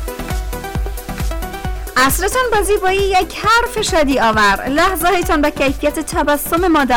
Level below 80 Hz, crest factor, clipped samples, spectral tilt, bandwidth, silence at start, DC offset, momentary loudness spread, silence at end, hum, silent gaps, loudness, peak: -26 dBFS; 10 dB; under 0.1%; -4 dB/octave; 19.5 kHz; 0 s; under 0.1%; 11 LU; 0 s; none; none; -15 LUFS; -6 dBFS